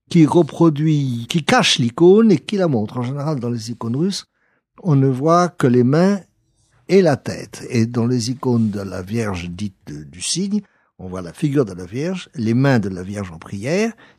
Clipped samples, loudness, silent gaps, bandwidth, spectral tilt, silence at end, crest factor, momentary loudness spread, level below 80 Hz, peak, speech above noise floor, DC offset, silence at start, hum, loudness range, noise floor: under 0.1%; -18 LUFS; none; 13.5 kHz; -6 dB/octave; 0.25 s; 16 dB; 15 LU; -56 dBFS; -2 dBFS; 43 dB; under 0.1%; 0.1 s; none; 7 LU; -60 dBFS